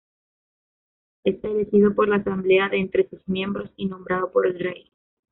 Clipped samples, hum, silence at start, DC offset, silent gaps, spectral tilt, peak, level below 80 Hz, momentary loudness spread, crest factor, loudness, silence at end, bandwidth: under 0.1%; none; 1.25 s; under 0.1%; none; -5 dB/octave; -6 dBFS; -56 dBFS; 11 LU; 16 dB; -23 LUFS; 0.6 s; 4 kHz